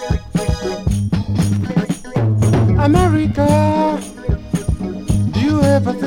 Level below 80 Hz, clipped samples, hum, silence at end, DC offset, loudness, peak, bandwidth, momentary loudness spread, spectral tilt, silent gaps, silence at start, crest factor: -28 dBFS; under 0.1%; none; 0 s; under 0.1%; -17 LUFS; 0 dBFS; 16 kHz; 8 LU; -7 dB/octave; none; 0 s; 16 dB